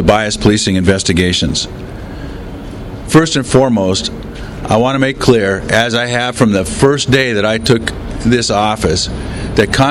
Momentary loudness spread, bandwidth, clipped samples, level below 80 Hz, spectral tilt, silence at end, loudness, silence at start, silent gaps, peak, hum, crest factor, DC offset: 16 LU; 14.5 kHz; 0.3%; -30 dBFS; -4.5 dB/octave; 0 s; -13 LUFS; 0 s; none; 0 dBFS; none; 12 dB; under 0.1%